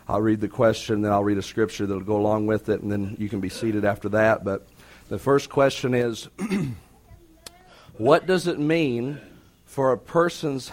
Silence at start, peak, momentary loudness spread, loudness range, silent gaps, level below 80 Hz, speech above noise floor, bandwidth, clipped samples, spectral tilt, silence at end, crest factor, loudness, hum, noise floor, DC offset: 0.1 s; -2 dBFS; 9 LU; 2 LU; none; -52 dBFS; 28 dB; 16.5 kHz; under 0.1%; -6 dB/octave; 0 s; 22 dB; -24 LUFS; none; -51 dBFS; under 0.1%